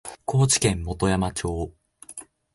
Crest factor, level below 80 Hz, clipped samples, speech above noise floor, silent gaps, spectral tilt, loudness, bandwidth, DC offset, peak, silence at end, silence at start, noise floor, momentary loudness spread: 18 dB; -40 dBFS; under 0.1%; 22 dB; none; -4.5 dB/octave; -23 LUFS; 12 kHz; under 0.1%; -6 dBFS; 0.3 s; 0.05 s; -45 dBFS; 20 LU